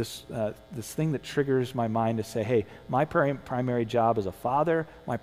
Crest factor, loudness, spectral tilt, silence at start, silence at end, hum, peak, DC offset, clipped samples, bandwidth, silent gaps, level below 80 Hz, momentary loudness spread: 16 dB; -28 LUFS; -6.5 dB/octave; 0 s; 0.05 s; none; -12 dBFS; under 0.1%; under 0.1%; 16 kHz; none; -58 dBFS; 8 LU